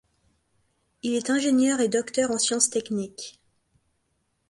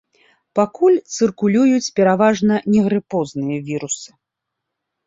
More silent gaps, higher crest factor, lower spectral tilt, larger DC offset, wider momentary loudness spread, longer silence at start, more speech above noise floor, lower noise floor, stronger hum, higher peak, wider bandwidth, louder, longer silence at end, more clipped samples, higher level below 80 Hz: neither; first, 22 dB vs 16 dB; second, -2.5 dB/octave vs -5.5 dB/octave; neither; first, 14 LU vs 10 LU; first, 1.05 s vs 0.55 s; second, 49 dB vs 64 dB; second, -73 dBFS vs -80 dBFS; neither; second, -6 dBFS vs -2 dBFS; first, 11.5 kHz vs 7.8 kHz; second, -24 LUFS vs -17 LUFS; first, 1.2 s vs 1 s; neither; second, -68 dBFS vs -58 dBFS